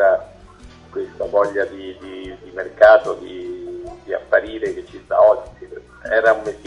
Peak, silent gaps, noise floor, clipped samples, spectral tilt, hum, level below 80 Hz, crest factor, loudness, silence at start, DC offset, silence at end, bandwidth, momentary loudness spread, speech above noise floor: 0 dBFS; none; -42 dBFS; under 0.1%; -5 dB/octave; none; -48 dBFS; 18 dB; -17 LUFS; 0 s; under 0.1%; 0.1 s; 9.8 kHz; 20 LU; 25 dB